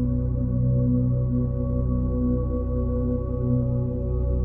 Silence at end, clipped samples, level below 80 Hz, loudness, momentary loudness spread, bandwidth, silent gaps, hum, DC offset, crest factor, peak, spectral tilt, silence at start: 0 s; under 0.1%; -28 dBFS; -25 LUFS; 4 LU; 1.6 kHz; none; none; under 0.1%; 12 dB; -12 dBFS; -15 dB/octave; 0 s